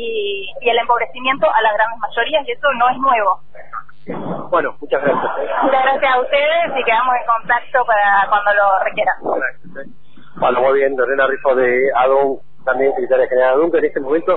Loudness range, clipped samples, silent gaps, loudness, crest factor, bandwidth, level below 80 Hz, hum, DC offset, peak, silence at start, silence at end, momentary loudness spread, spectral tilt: 3 LU; under 0.1%; none; -16 LUFS; 14 dB; 4.1 kHz; -52 dBFS; none; 4%; -2 dBFS; 0 s; 0 s; 10 LU; -8 dB/octave